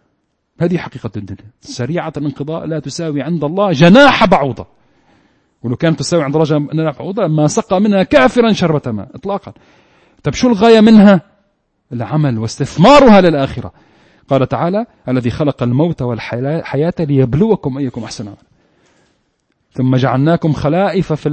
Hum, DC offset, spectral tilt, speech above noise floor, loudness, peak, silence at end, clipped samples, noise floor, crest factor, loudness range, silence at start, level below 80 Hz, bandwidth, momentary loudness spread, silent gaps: none; under 0.1%; -6.5 dB/octave; 52 dB; -13 LUFS; 0 dBFS; 0 s; 0.1%; -64 dBFS; 14 dB; 7 LU; 0.6 s; -40 dBFS; 8.8 kHz; 17 LU; none